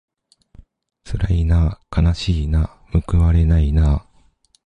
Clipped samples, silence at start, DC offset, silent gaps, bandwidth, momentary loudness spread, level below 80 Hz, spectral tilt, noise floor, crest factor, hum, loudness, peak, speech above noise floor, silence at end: under 0.1%; 1.05 s; under 0.1%; none; 9 kHz; 7 LU; -20 dBFS; -8 dB/octave; -56 dBFS; 14 dB; none; -18 LUFS; -4 dBFS; 40 dB; 0.65 s